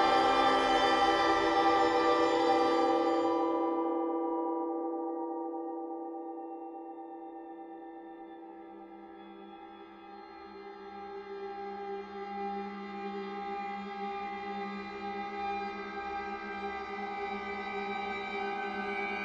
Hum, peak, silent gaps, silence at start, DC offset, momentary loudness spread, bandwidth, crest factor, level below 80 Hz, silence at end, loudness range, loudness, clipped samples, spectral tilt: none; -14 dBFS; none; 0 s; under 0.1%; 22 LU; 11 kHz; 18 dB; -64 dBFS; 0 s; 20 LU; -32 LUFS; under 0.1%; -4.5 dB/octave